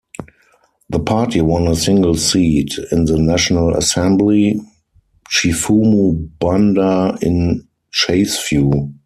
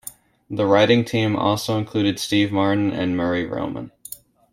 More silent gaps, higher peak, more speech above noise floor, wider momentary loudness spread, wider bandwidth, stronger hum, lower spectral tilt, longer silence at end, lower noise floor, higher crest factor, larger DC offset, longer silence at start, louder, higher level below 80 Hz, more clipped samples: neither; about the same, -2 dBFS vs -2 dBFS; first, 42 dB vs 22 dB; second, 6 LU vs 18 LU; second, 14.5 kHz vs 16.5 kHz; neither; about the same, -5 dB/octave vs -5.5 dB/octave; second, 0.15 s vs 0.35 s; first, -56 dBFS vs -42 dBFS; about the same, 14 dB vs 18 dB; neither; first, 0.2 s vs 0.05 s; first, -15 LUFS vs -20 LUFS; first, -36 dBFS vs -56 dBFS; neither